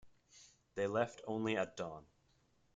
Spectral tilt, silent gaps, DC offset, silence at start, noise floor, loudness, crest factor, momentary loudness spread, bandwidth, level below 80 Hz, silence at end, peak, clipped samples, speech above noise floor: -5.5 dB/octave; none; under 0.1%; 0.05 s; -75 dBFS; -40 LUFS; 20 dB; 12 LU; 9.4 kHz; -76 dBFS; 0.75 s; -22 dBFS; under 0.1%; 35 dB